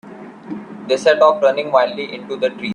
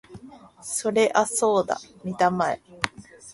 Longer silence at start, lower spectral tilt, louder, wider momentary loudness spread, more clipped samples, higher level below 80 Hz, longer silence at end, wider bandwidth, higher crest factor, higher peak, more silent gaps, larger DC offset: about the same, 0.05 s vs 0.1 s; about the same, -4.5 dB/octave vs -3.5 dB/octave; first, -16 LUFS vs -24 LUFS; first, 19 LU vs 10 LU; neither; second, -66 dBFS vs -60 dBFS; about the same, 0 s vs 0 s; second, 10 kHz vs 11.5 kHz; second, 18 dB vs 24 dB; about the same, 0 dBFS vs -2 dBFS; neither; neither